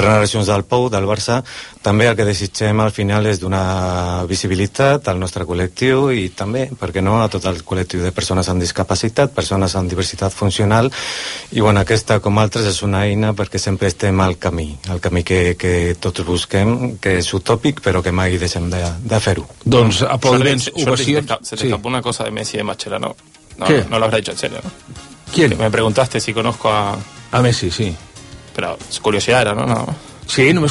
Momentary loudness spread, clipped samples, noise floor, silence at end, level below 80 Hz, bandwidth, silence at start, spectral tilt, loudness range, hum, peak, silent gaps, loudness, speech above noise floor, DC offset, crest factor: 8 LU; under 0.1%; -37 dBFS; 0 s; -38 dBFS; 11.5 kHz; 0 s; -5 dB/octave; 3 LU; none; 0 dBFS; none; -17 LUFS; 20 dB; under 0.1%; 16 dB